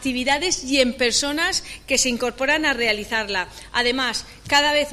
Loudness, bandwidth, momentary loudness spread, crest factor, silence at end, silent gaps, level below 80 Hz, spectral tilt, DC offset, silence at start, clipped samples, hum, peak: -20 LUFS; 15.5 kHz; 7 LU; 16 dB; 0 s; none; -46 dBFS; -1 dB/octave; under 0.1%; 0 s; under 0.1%; none; -6 dBFS